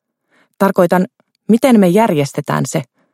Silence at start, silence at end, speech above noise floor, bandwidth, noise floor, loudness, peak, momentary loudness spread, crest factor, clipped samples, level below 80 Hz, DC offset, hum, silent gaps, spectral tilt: 0.6 s; 0.3 s; 46 dB; 15.5 kHz; -58 dBFS; -14 LUFS; 0 dBFS; 12 LU; 14 dB; under 0.1%; -60 dBFS; under 0.1%; none; none; -6.5 dB/octave